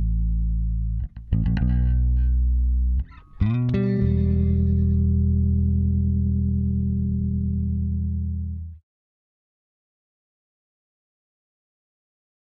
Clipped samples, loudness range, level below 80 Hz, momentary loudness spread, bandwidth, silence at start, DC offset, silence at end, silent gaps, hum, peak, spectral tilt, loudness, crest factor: under 0.1%; 10 LU; -26 dBFS; 7 LU; 4.3 kHz; 0 s; under 0.1%; 3.7 s; none; none; -8 dBFS; -12 dB/octave; -23 LUFS; 14 dB